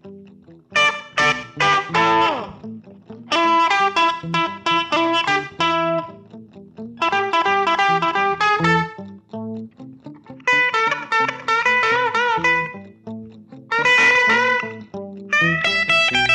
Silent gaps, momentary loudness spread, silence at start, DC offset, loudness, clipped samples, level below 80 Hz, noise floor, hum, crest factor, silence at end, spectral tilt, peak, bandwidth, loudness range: none; 19 LU; 0.05 s; under 0.1%; -17 LUFS; under 0.1%; -56 dBFS; -46 dBFS; none; 14 dB; 0 s; -3.5 dB/octave; -6 dBFS; 11 kHz; 3 LU